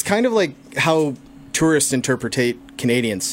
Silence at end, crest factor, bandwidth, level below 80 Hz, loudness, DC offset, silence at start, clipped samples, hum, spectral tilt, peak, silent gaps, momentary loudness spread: 0 s; 16 dB; 16.5 kHz; -52 dBFS; -19 LUFS; under 0.1%; 0 s; under 0.1%; none; -4 dB/octave; -2 dBFS; none; 8 LU